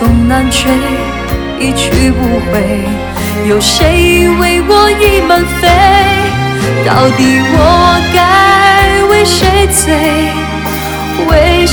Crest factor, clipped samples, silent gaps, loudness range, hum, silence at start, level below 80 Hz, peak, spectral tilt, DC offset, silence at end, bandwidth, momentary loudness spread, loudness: 8 dB; 0.8%; none; 4 LU; none; 0 s; -18 dBFS; 0 dBFS; -4.5 dB/octave; 0.7%; 0 s; over 20 kHz; 9 LU; -8 LUFS